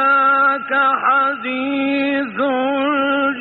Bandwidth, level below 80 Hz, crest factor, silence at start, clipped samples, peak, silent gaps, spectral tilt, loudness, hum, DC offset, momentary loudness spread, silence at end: 4.5 kHz; -64 dBFS; 10 dB; 0 s; under 0.1%; -6 dBFS; none; -1 dB/octave; -16 LUFS; none; under 0.1%; 6 LU; 0 s